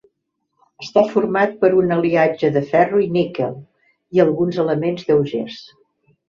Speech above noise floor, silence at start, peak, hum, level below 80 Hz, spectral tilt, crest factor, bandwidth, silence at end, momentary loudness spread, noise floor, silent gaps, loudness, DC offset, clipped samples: 56 dB; 0.8 s; -2 dBFS; none; -60 dBFS; -7.5 dB/octave; 16 dB; 7 kHz; 0.65 s; 10 LU; -73 dBFS; none; -18 LUFS; under 0.1%; under 0.1%